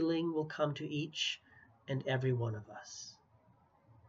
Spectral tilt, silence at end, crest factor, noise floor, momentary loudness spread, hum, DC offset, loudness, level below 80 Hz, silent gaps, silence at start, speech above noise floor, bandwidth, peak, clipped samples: -5.5 dB/octave; 0.95 s; 18 dB; -68 dBFS; 14 LU; none; under 0.1%; -37 LUFS; -78 dBFS; none; 0 s; 31 dB; 7.8 kHz; -20 dBFS; under 0.1%